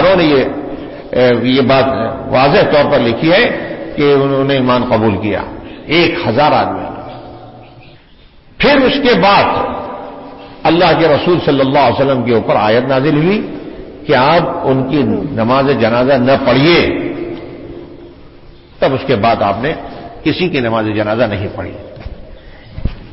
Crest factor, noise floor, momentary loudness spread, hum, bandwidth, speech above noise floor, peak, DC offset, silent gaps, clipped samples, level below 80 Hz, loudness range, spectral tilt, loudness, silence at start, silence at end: 12 dB; -42 dBFS; 18 LU; none; 5.8 kHz; 31 dB; 0 dBFS; under 0.1%; none; under 0.1%; -36 dBFS; 5 LU; -10 dB/octave; -12 LUFS; 0 s; 0 s